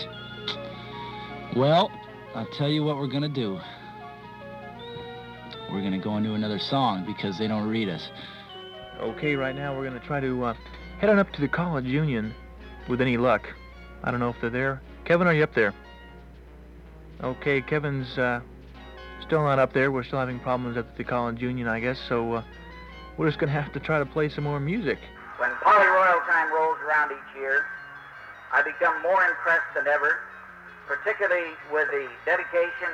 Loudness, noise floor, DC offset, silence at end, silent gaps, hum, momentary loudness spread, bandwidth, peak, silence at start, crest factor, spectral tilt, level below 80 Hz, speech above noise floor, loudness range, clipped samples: -25 LUFS; -46 dBFS; under 0.1%; 0 s; none; none; 20 LU; 10.5 kHz; -8 dBFS; 0 s; 18 dB; -7.5 dB/octave; -50 dBFS; 21 dB; 8 LU; under 0.1%